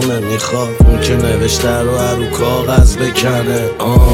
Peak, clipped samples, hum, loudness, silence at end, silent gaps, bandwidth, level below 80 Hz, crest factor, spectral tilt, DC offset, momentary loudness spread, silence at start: 0 dBFS; under 0.1%; none; -13 LUFS; 0 s; none; 17 kHz; -16 dBFS; 12 dB; -5.5 dB/octave; under 0.1%; 6 LU; 0 s